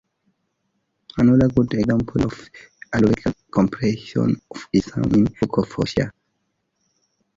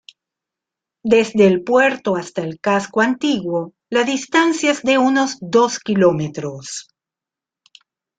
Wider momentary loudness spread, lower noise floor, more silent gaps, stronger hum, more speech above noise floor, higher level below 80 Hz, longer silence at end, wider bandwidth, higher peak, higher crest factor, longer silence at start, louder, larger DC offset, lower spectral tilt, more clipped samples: second, 9 LU vs 12 LU; second, -73 dBFS vs -88 dBFS; neither; neither; second, 54 dB vs 71 dB; first, -44 dBFS vs -60 dBFS; about the same, 1.25 s vs 1.35 s; second, 7.6 kHz vs 9.4 kHz; about the same, -4 dBFS vs -2 dBFS; about the same, 18 dB vs 16 dB; about the same, 1.15 s vs 1.05 s; second, -20 LUFS vs -17 LUFS; neither; first, -7.5 dB/octave vs -4.5 dB/octave; neither